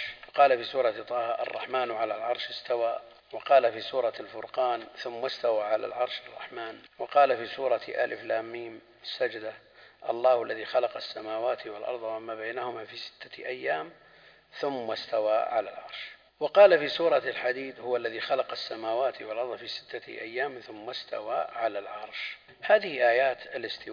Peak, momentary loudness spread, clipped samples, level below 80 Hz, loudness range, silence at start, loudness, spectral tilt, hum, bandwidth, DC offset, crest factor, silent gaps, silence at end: -6 dBFS; 16 LU; under 0.1%; -78 dBFS; 8 LU; 0 s; -29 LUFS; -4.5 dB/octave; none; 5.2 kHz; under 0.1%; 22 dB; none; 0 s